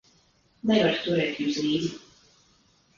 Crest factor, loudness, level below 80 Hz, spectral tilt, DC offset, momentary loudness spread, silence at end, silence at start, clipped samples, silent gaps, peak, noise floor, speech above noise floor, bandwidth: 18 dB; -26 LUFS; -64 dBFS; -5.5 dB/octave; under 0.1%; 10 LU; 1 s; 0.65 s; under 0.1%; none; -10 dBFS; -63 dBFS; 39 dB; 7.4 kHz